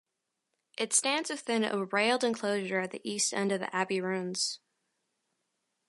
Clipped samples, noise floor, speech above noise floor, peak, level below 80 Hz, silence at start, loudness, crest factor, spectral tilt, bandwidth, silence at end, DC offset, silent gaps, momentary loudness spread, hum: under 0.1%; -84 dBFS; 53 dB; -14 dBFS; -84 dBFS; 0.8 s; -30 LUFS; 20 dB; -2.5 dB/octave; 11.5 kHz; 1.3 s; under 0.1%; none; 6 LU; none